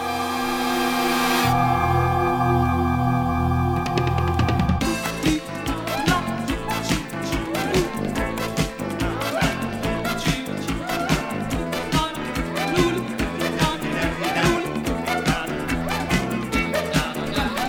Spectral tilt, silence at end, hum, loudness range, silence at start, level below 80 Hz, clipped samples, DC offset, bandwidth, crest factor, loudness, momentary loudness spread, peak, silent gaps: -5 dB/octave; 0 s; none; 4 LU; 0 s; -36 dBFS; under 0.1%; under 0.1%; 19 kHz; 18 dB; -23 LUFS; 6 LU; -6 dBFS; none